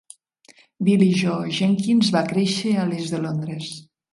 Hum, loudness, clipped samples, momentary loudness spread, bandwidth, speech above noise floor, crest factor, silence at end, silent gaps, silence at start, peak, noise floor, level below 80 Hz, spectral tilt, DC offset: none; -21 LUFS; under 0.1%; 12 LU; 11.5 kHz; 34 dB; 16 dB; 0.3 s; none; 0.8 s; -6 dBFS; -54 dBFS; -64 dBFS; -6 dB/octave; under 0.1%